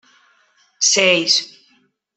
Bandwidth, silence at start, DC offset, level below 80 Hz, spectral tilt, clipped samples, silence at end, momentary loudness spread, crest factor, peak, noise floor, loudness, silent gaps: 8.6 kHz; 0.8 s; under 0.1%; -72 dBFS; -0.5 dB/octave; under 0.1%; 0.7 s; 7 LU; 18 dB; -2 dBFS; -60 dBFS; -14 LUFS; none